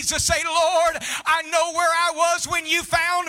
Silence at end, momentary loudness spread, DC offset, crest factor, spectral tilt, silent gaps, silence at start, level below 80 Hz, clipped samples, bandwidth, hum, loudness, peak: 0 s; 3 LU; under 0.1%; 14 dB; -1 dB/octave; none; 0 s; -46 dBFS; under 0.1%; 17.5 kHz; none; -20 LUFS; -6 dBFS